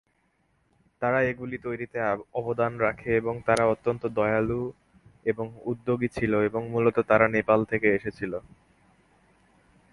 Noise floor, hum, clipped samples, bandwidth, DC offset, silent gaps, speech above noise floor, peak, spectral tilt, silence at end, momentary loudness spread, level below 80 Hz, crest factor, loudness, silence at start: -70 dBFS; none; under 0.1%; 11.5 kHz; under 0.1%; none; 44 dB; -4 dBFS; -7.5 dB/octave; 1.5 s; 11 LU; -56 dBFS; 24 dB; -26 LUFS; 1 s